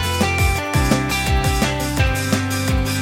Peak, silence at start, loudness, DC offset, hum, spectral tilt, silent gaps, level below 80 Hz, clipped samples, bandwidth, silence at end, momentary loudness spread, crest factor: -2 dBFS; 0 s; -19 LUFS; under 0.1%; none; -4.5 dB/octave; none; -24 dBFS; under 0.1%; 16.5 kHz; 0 s; 2 LU; 16 dB